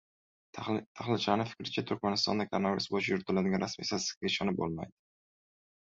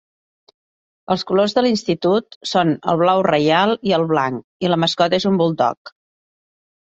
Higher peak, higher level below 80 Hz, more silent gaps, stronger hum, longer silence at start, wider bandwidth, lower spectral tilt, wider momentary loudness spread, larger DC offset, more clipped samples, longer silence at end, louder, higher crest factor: second, -12 dBFS vs -2 dBFS; about the same, -64 dBFS vs -60 dBFS; second, 0.86-0.95 s, 4.17-4.21 s vs 2.36-2.41 s, 4.44-4.60 s, 5.77-5.85 s; neither; second, 0.55 s vs 1.1 s; about the same, 7.8 kHz vs 8.4 kHz; second, -4.5 dB/octave vs -6 dB/octave; about the same, 7 LU vs 6 LU; neither; neither; about the same, 1.05 s vs 0.95 s; second, -33 LUFS vs -18 LUFS; first, 22 dB vs 16 dB